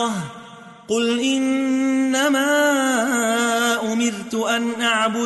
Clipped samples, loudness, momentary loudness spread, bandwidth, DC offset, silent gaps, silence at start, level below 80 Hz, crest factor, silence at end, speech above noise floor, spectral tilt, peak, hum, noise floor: under 0.1%; -19 LUFS; 7 LU; 12 kHz; under 0.1%; none; 0 s; -66 dBFS; 14 dB; 0 s; 22 dB; -3 dB/octave; -6 dBFS; none; -41 dBFS